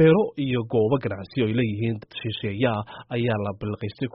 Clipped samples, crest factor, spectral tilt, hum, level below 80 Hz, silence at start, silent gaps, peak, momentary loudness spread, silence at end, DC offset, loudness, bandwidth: under 0.1%; 16 dB; -6 dB/octave; none; -54 dBFS; 0 s; none; -8 dBFS; 9 LU; 0.05 s; under 0.1%; -25 LUFS; 5.6 kHz